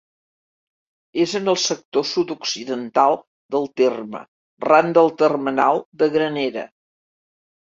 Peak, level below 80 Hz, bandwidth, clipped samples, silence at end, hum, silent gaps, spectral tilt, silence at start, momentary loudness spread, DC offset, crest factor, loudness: -2 dBFS; -68 dBFS; 7.8 kHz; under 0.1%; 1.05 s; none; 1.85-1.92 s, 3.27-3.49 s, 4.28-4.57 s, 5.85-5.92 s; -4 dB/octave; 1.15 s; 13 LU; under 0.1%; 20 dB; -20 LUFS